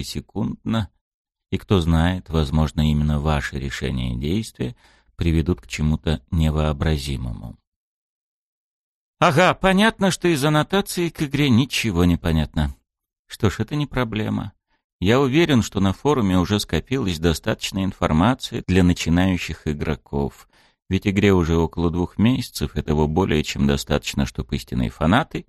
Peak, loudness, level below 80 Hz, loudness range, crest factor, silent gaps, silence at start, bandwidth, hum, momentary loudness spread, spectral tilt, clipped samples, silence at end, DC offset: -4 dBFS; -21 LUFS; -32 dBFS; 4 LU; 18 dB; 1.01-1.25 s, 7.67-9.14 s, 13.19-13.25 s, 14.84-14.99 s; 0 s; 13 kHz; none; 9 LU; -6 dB/octave; under 0.1%; 0.05 s; under 0.1%